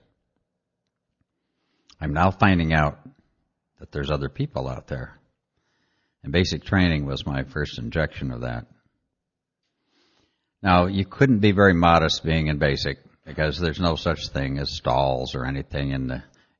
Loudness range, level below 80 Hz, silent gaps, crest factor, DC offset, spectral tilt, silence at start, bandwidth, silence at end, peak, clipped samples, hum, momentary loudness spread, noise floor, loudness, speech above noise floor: 10 LU; -40 dBFS; none; 22 dB; under 0.1%; -6.5 dB/octave; 2 s; 7.2 kHz; 0.4 s; -2 dBFS; under 0.1%; none; 14 LU; -83 dBFS; -23 LUFS; 61 dB